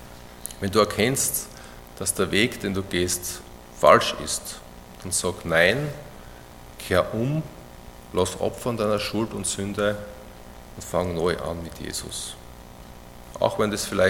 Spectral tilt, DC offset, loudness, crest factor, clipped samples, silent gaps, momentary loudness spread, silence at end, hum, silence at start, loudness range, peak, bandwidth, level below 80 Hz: -3.5 dB/octave; under 0.1%; -24 LUFS; 24 dB; under 0.1%; none; 24 LU; 0 s; 60 Hz at -55 dBFS; 0 s; 6 LU; 0 dBFS; 17.5 kHz; -48 dBFS